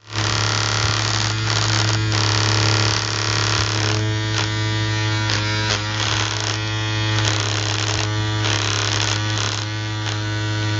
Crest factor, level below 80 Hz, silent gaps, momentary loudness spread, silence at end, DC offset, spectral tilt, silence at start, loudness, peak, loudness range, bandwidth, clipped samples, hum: 20 dB; -40 dBFS; none; 5 LU; 0 s; under 0.1%; -3.5 dB/octave; 0.05 s; -19 LUFS; 0 dBFS; 2 LU; 8.2 kHz; under 0.1%; none